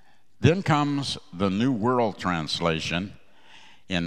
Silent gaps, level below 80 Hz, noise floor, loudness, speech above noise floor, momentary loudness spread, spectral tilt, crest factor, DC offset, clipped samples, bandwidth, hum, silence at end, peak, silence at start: none; -54 dBFS; -53 dBFS; -25 LUFS; 29 dB; 8 LU; -6 dB/octave; 22 dB; 0.4%; under 0.1%; 11.5 kHz; none; 0 s; -4 dBFS; 0.4 s